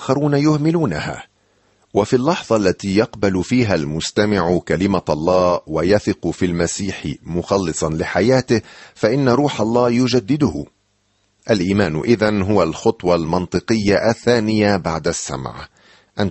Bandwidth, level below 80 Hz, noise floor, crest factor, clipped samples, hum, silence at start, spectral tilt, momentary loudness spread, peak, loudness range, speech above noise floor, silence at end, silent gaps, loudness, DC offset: 8.6 kHz; -44 dBFS; -63 dBFS; 16 dB; under 0.1%; none; 0 s; -6 dB/octave; 8 LU; -2 dBFS; 2 LU; 46 dB; 0 s; none; -18 LUFS; under 0.1%